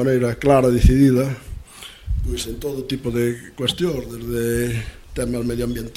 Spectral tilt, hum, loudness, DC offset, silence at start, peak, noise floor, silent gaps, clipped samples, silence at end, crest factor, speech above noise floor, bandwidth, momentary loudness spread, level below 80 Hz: -6 dB/octave; none; -20 LUFS; under 0.1%; 0 s; 0 dBFS; -39 dBFS; none; under 0.1%; 0.05 s; 20 dB; 20 dB; 16.5 kHz; 15 LU; -28 dBFS